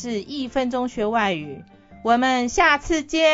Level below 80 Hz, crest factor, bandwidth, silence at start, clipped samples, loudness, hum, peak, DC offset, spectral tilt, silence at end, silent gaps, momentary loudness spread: -44 dBFS; 18 dB; 8 kHz; 0 s; under 0.1%; -21 LUFS; none; -4 dBFS; under 0.1%; -3.5 dB/octave; 0 s; none; 12 LU